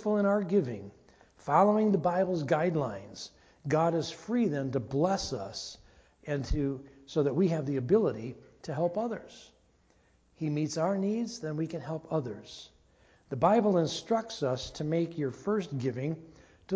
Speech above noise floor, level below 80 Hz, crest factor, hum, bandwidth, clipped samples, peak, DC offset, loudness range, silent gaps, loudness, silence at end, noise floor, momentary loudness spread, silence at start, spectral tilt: 36 dB; -52 dBFS; 20 dB; none; 8 kHz; under 0.1%; -10 dBFS; under 0.1%; 5 LU; none; -30 LUFS; 0 s; -66 dBFS; 17 LU; 0 s; -6.5 dB/octave